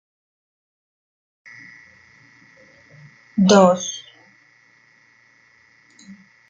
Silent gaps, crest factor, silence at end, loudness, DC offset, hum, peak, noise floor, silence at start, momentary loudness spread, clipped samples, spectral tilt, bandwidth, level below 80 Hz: none; 22 dB; 0.35 s; -16 LUFS; under 0.1%; none; -2 dBFS; -55 dBFS; 3.35 s; 29 LU; under 0.1%; -5 dB/octave; 7.6 kHz; -66 dBFS